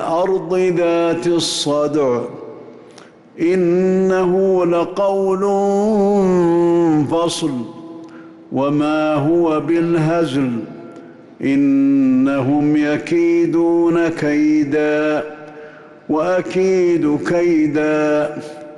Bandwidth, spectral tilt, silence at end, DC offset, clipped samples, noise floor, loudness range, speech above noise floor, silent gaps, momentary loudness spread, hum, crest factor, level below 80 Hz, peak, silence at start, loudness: 12 kHz; -6 dB/octave; 0 s; under 0.1%; under 0.1%; -42 dBFS; 3 LU; 27 dB; none; 10 LU; none; 8 dB; -54 dBFS; -8 dBFS; 0 s; -16 LUFS